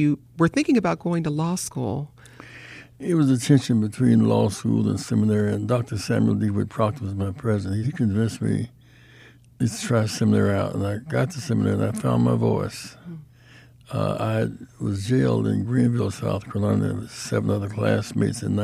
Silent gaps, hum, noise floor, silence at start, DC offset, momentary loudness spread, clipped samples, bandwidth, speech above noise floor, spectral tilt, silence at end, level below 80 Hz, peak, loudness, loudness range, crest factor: none; none; -50 dBFS; 0 s; under 0.1%; 11 LU; under 0.1%; 14.5 kHz; 28 dB; -7 dB/octave; 0 s; -54 dBFS; -6 dBFS; -23 LUFS; 5 LU; 16 dB